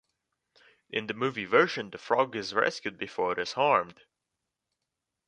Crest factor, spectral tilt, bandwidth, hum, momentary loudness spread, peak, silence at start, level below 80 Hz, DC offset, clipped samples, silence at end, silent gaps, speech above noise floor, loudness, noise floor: 24 dB; -4.5 dB/octave; 10 kHz; none; 11 LU; -8 dBFS; 0.9 s; -72 dBFS; under 0.1%; under 0.1%; 1.35 s; none; 57 dB; -28 LUFS; -86 dBFS